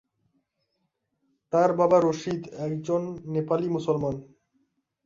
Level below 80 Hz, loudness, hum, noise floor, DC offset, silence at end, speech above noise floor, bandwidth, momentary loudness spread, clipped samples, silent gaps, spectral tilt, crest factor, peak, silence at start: -64 dBFS; -26 LUFS; none; -77 dBFS; under 0.1%; 0.8 s; 52 dB; 7.6 kHz; 11 LU; under 0.1%; none; -7.5 dB/octave; 20 dB; -8 dBFS; 1.5 s